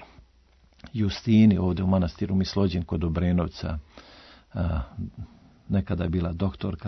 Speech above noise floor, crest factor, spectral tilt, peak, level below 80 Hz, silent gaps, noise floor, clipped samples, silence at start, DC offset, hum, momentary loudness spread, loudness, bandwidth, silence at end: 34 dB; 18 dB; -8 dB/octave; -8 dBFS; -44 dBFS; none; -59 dBFS; under 0.1%; 0 s; under 0.1%; none; 17 LU; -26 LUFS; 6.2 kHz; 0 s